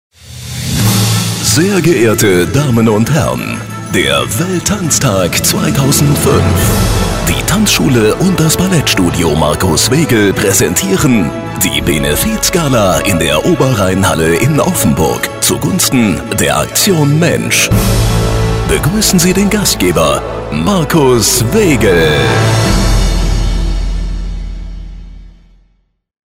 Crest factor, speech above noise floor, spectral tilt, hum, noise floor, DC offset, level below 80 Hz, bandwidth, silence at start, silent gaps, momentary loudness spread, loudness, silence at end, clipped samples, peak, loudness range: 10 dB; 45 dB; -4.5 dB/octave; none; -56 dBFS; under 0.1%; -22 dBFS; 16.5 kHz; 0.25 s; none; 7 LU; -10 LUFS; 0.95 s; under 0.1%; 0 dBFS; 2 LU